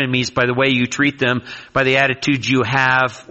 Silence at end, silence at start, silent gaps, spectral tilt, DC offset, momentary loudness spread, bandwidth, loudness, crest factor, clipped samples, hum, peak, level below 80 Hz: 0.1 s; 0 s; none; -5 dB/octave; under 0.1%; 5 LU; 8.2 kHz; -16 LUFS; 16 dB; under 0.1%; none; -2 dBFS; -50 dBFS